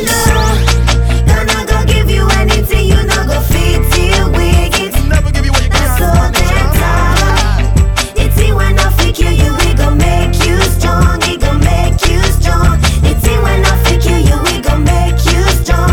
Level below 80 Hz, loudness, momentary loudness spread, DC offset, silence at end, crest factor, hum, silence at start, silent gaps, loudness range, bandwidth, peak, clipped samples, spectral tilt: -12 dBFS; -11 LUFS; 2 LU; under 0.1%; 0 s; 8 dB; none; 0 s; none; 1 LU; 19.5 kHz; 0 dBFS; under 0.1%; -4.5 dB/octave